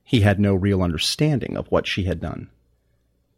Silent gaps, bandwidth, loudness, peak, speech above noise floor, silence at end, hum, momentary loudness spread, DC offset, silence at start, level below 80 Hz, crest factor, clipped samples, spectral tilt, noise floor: none; 15.5 kHz; -21 LUFS; -4 dBFS; 45 dB; 0.9 s; none; 10 LU; under 0.1%; 0.1 s; -46 dBFS; 18 dB; under 0.1%; -6 dB/octave; -65 dBFS